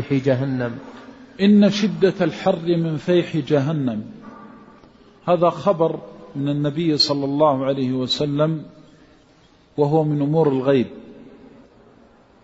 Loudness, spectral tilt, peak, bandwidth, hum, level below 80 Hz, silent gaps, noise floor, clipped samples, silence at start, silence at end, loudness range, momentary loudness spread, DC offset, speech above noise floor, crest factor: -20 LUFS; -7 dB/octave; -4 dBFS; 8 kHz; none; -58 dBFS; none; -53 dBFS; under 0.1%; 0 s; 1.05 s; 3 LU; 14 LU; under 0.1%; 34 dB; 16 dB